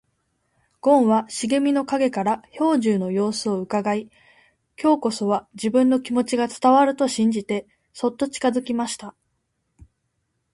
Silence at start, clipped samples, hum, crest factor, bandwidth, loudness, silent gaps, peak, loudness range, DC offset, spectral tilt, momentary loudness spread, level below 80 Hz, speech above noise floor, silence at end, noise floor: 0.85 s; under 0.1%; none; 18 dB; 11.5 kHz; -21 LUFS; none; -4 dBFS; 4 LU; under 0.1%; -5 dB/octave; 9 LU; -64 dBFS; 53 dB; 1.45 s; -73 dBFS